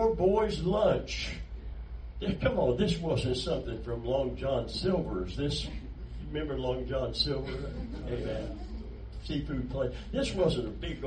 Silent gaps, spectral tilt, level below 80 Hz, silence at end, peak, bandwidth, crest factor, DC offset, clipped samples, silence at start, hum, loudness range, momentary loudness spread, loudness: none; -6 dB/octave; -40 dBFS; 0 s; -14 dBFS; 9.8 kHz; 18 dB; under 0.1%; under 0.1%; 0 s; none; 4 LU; 15 LU; -32 LUFS